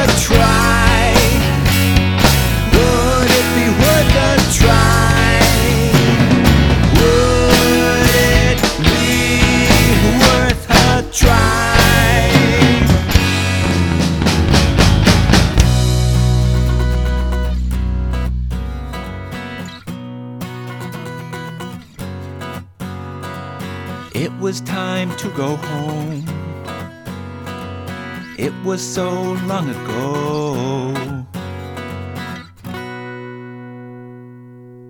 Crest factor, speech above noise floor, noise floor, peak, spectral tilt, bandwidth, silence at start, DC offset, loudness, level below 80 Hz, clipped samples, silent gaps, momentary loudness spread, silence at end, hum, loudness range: 14 dB; 17 dB; -37 dBFS; 0 dBFS; -5 dB/octave; 19.5 kHz; 0 s; under 0.1%; -13 LUFS; -22 dBFS; under 0.1%; none; 18 LU; 0 s; none; 16 LU